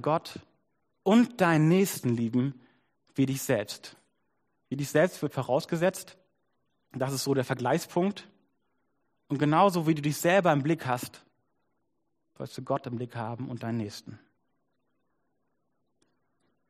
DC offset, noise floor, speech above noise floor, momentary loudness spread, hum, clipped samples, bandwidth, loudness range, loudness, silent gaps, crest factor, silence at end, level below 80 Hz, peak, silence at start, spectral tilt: under 0.1%; -80 dBFS; 53 dB; 18 LU; none; under 0.1%; 15.5 kHz; 10 LU; -28 LUFS; none; 20 dB; 2.55 s; -72 dBFS; -8 dBFS; 0 s; -6 dB/octave